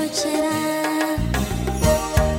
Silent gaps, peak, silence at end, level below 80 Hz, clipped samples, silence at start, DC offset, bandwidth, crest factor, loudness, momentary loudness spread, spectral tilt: none; -2 dBFS; 0 s; -28 dBFS; under 0.1%; 0 s; under 0.1%; 17 kHz; 18 dB; -21 LUFS; 4 LU; -5 dB/octave